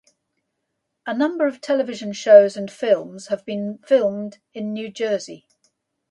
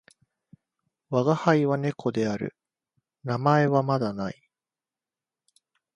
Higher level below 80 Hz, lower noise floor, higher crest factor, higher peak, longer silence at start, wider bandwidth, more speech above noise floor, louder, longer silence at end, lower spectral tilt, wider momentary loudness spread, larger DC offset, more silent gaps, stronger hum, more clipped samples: second, -74 dBFS vs -66 dBFS; second, -77 dBFS vs under -90 dBFS; about the same, 20 dB vs 22 dB; first, 0 dBFS vs -6 dBFS; about the same, 1.05 s vs 1.1 s; about the same, 9.4 kHz vs 9.8 kHz; second, 57 dB vs over 66 dB; first, -20 LUFS vs -25 LUFS; second, 0.75 s vs 1.65 s; second, -5 dB/octave vs -7.5 dB/octave; first, 18 LU vs 13 LU; neither; neither; neither; neither